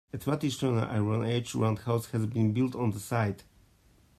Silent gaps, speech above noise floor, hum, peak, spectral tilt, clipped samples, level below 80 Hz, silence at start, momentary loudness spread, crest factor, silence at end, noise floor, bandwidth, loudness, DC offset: none; 33 dB; none; -14 dBFS; -6.5 dB/octave; under 0.1%; -62 dBFS; 0.15 s; 4 LU; 16 dB; 0.75 s; -62 dBFS; 14.5 kHz; -30 LUFS; under 0.1%